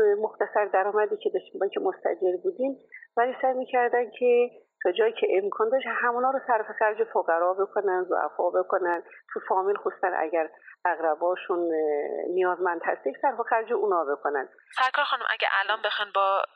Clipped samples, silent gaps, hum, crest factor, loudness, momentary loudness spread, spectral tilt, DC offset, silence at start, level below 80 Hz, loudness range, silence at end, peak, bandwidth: under 0.1%; none; none; 18 dB; -26 LUFS; 5 LU; -4.5 dB/octave; under 0.1%; 0 s; -88 dBFS; 2 LU; 0.1 s; -8 dBFS; 7.8 kHz